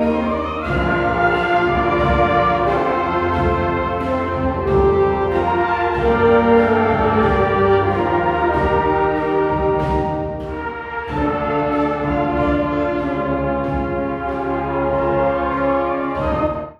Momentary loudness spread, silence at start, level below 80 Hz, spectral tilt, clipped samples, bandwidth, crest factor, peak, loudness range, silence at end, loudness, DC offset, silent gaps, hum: 6 LU; 0 s; -32 dBFS; -8.5 dB/octave; under 0.1%; 8 kHz; 16 dB; -2 dBFS; 4 LU; 0.05 s; -18 LUFS; under 0.1%; none; none